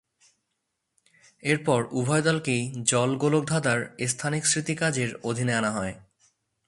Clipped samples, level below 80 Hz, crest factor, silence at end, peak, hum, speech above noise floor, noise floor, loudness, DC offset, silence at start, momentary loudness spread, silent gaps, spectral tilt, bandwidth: under 0.1%; -62 dBFS; 20 dB; 0.7 s; -6 dBFS; none; 54 dB; -80 dBFS; -25 LUFS; under 0.1%; 1.45 s; 5 LU; none; -4 dB/octave; 11.5 kHz